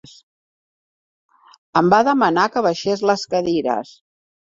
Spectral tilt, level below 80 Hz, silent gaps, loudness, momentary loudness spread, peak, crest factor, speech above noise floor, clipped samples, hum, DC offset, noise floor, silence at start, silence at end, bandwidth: -5.5 dB/octave; -60 dBFS; none; -18 LUFS; 9 LU; -2 dBFS; 18 dB; over 73 dB; under 0.1%; none; under 0.1%; under -90 dBFS; 1.75 s; 0.6 s; 7.8 kHz